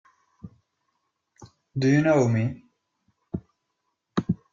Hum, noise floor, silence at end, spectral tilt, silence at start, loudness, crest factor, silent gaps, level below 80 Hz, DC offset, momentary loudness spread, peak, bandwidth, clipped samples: none; -78 dBFS; 0.15 s; -7.5 dB/octave; 0.45 s; -24 LUFS; 18 dB; none; -60 dBFS; under 0.1%; 18 LU; -8 dBFS; 7.6 kHz; under 0.1%